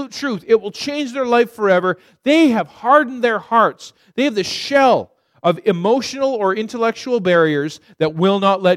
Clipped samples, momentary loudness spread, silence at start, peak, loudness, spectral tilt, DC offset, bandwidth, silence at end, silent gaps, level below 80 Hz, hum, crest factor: under 0.1%; 9 LU; 0 s; 0 dBFS; -17 LUFS; -5.5 dB/octave; under 0.1%; 14.5 kHz; 0 s; none; -64 dBFS; none; 16 dB